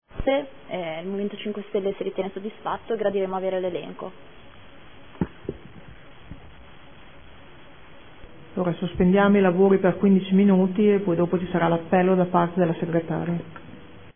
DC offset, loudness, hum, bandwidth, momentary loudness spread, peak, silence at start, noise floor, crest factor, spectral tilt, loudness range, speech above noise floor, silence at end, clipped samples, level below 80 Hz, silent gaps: 0.5%; -23 LUFS; none; 3.6 kHz; 15 LU; -6 dBFS; 0 s; -48 dBFS; 18 dB; -11.5 dB/octave; 19 LU; 26 dB; 0.15 s; under 0.1%; -50 dBFS; none